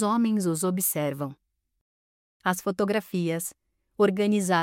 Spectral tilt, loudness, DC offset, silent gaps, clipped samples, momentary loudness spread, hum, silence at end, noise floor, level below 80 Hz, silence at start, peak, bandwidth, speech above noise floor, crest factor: -5 dB/octave; -26 LUFS; under 0.1%; 1.81-2.40 s; under 0.1%; 9 LU; none; 0 s; under -90 dBFS; -72 dBFS; 0 s; -10 dBFS; 17 kHz; over 65 dB; 18 dB